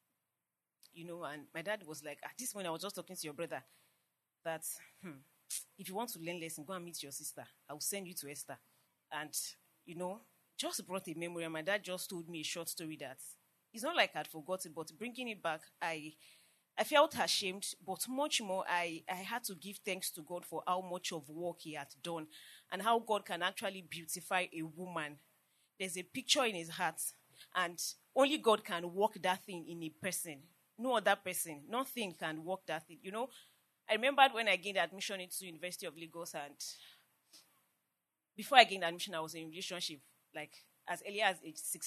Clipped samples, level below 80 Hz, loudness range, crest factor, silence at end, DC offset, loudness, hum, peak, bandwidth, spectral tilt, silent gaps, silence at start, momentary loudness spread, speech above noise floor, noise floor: under 0.1%; under -90 dBFS; 9 LU; 32 dB; 0 s; under 0.1%; -38 LUFS; none; -6 dBFS; 13.5 kHz; -2 dB/octave; none; 0.95 s; 15 LU; over 51 dB; under -90 dBFS